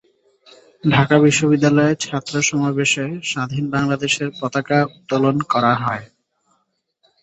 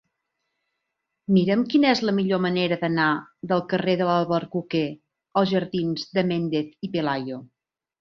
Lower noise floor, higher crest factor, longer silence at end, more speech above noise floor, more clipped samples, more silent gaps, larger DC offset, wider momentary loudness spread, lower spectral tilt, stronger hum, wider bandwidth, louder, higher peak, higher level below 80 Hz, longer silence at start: second, -68 dBFS vs -80 dBFS; about the same, 18 dB vs 18 dB; first, 1.15 s vs 0.55 s; second, 51 dB vs 58 dB; neither; neither; neither; about the same, 9 LU vs 9 LU; second, -5 dB/octave vs -7 dB/octave; neither; first, 8.4 kHz vs 6.6 kHz; first, -18 LUFS vs -23 LUFS; first, -2 dBFS vs -6 dBFS; first, -56 dBFS vs -64 dBFS; second, 0.85 s vs 1.3 s